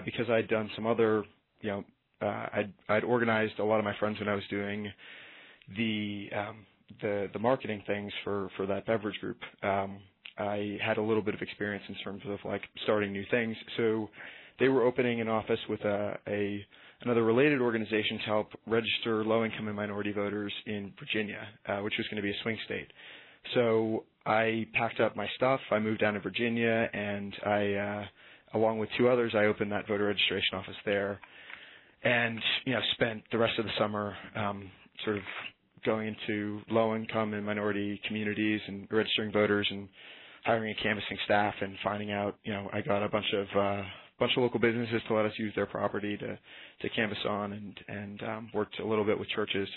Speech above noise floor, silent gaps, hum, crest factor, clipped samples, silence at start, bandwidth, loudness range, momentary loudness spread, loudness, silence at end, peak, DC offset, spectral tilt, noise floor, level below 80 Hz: 21 dB; none; none; 20 dB; under 0.1%; 0 s; 4.3 kHz; 5 LU; 13 LU; -31 LUFS; 0 s; -12 dBFS; under 0.1%; -9 dB/octave; -52 dBFS; -68 dBFS